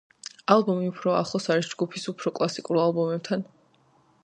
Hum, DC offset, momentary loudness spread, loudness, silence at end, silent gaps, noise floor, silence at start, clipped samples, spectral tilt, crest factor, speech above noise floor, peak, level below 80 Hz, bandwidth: none; under 0.1%; 9 LU; -26 LUFS; 0.8 s; none; -62 dBFS; 0.5 s; under 0.1%; -5.5 dB/octave; 24 dB; 37 dB; -2 dBFS; -72 dBFS; 10 kHz